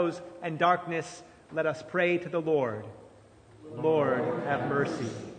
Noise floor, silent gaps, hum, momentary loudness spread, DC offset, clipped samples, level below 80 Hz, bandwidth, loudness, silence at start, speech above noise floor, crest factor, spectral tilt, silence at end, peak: -55 dBFS; none; none; 14 LU; under 0.1%; under 0.1%; -68 dBFS; 9.4 kHz; -29 LUFS; 0 s; 26 dB; 20 dB; -6 dB/octave; 0 s; -10 dBFS